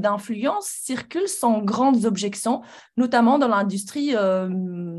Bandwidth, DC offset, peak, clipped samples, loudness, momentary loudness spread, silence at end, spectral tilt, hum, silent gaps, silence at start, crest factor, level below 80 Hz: 13 kHz; under 0.1%; -6 dBFS; under 0.1%; -22 LUFS; 10 LU; 0 s; -5 dB/octave; none; none; 0 s; 16 dB; -68 dBFS